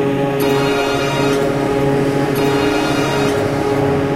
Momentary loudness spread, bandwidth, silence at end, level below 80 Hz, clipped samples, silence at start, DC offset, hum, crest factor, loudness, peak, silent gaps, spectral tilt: 1 LU; 16 kHz; 0 s; -40 dBFS; under 0.1%; 0 s; 0.3%; none; 12 dB; -16 LUFS; -4 dBFS; none; -5.5 dB/octave